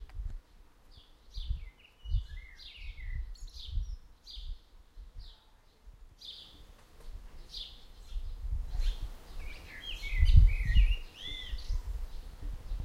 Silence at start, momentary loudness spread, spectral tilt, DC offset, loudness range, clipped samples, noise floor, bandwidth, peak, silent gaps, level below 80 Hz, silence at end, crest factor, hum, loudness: 0 s; 23 LU; -5 dB/octave; under 0.1%; 17 LU; under 0.1%; -61 dBFS; 7.4 kHz; -8 dBFS; none; -34 dBFS; 0 s; 26 dB; none; -36 LUFS